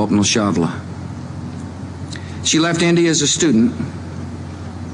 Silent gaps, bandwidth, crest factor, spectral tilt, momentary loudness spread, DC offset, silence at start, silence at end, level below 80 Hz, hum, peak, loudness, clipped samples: none; 11 kHz; 12 dB; -4 dB/octave; 16 LU; under 0.1%; 0 s; 0 s; -46 dBFS; none; -6 dBFS; -16 LUFS; under 0.1%